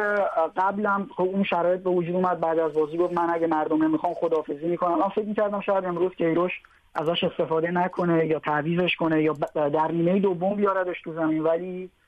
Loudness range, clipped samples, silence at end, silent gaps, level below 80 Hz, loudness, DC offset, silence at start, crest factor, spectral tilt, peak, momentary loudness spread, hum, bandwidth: 2 LU; under 0.1%; 0.2 s; none; -64 dBFS; -24 LUFS; under 0.1%; 0 s; 12 dB; -8 dB/octave; -12 dBFS; 4 LU; none; 8 kHz